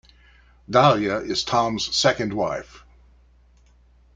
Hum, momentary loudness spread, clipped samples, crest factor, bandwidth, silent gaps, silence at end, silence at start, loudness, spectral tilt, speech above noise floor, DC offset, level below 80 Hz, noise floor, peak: 60 Hz at -50 dBFS; 9 LU; under 0.1%; 22 dB; 9.4 kHz; none; 1.4 s; 0.7 s; -21 LUFS; -4 dB/octave; 34 dB; under 0.1%; -52 dBFS; -55 dBFS; -2 dBFS